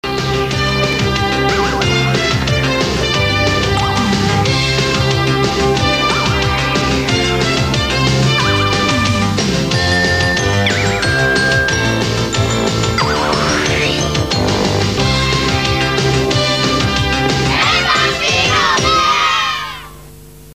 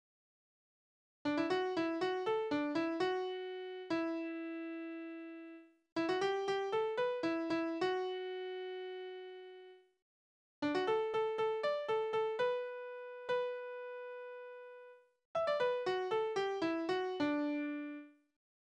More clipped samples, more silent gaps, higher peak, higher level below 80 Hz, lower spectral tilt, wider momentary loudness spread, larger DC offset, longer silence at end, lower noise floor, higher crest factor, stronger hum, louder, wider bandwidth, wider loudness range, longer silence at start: neither; second, none vs 5.92-5.96 s, 10.02-10.62 s, 15.25-15.34 s; first, 0 dBFS vs -22 dBFS; first, -28 dBFS vs -80 dBFS; about the same, -4 dB/octave vs -5 dB/octave; second, 3 LU vs 14 LU; first, 0.4% vs under 0.1%; second, 0 s vs 0.7 s; second, -36 dBFS vs -59 dBFS; about the same, 14 dB vs 16 dB; neither; first, -13 LUFS vs -38 LUFS; first, 16 kHz vs 9.8 kHz; about the same, 2 LU vs 4 LU; second, 0.05 s vs 1.25 s